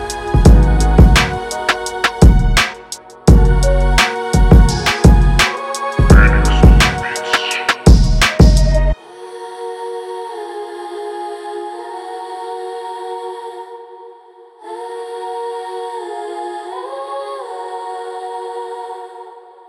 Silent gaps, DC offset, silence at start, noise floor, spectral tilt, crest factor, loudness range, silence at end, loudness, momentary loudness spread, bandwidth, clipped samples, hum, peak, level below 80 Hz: none; under 0.1%; 0 s; -42 dBFS; -5.5 dB/octave; 14 dB; 16 LU; 0.3 s; -13 LUFS; 18 LU; 13.5 kHz; under 0.1%; none; 0 dBFS; -16 dBFS